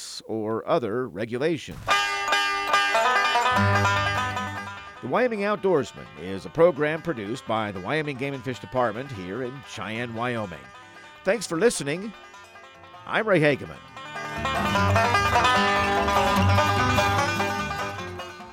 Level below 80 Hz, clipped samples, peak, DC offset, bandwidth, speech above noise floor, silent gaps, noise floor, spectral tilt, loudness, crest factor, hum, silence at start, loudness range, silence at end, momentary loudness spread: -50 dBFS; under 0.1%; -6 dBFS; under 0.1%; 16.5 kHz; 22 dB; none; -47 dBFS; -4.5 dB/octave; -24 LUFS; 18 dB; none; 0 s; 8 LU; 0 s; 14 LU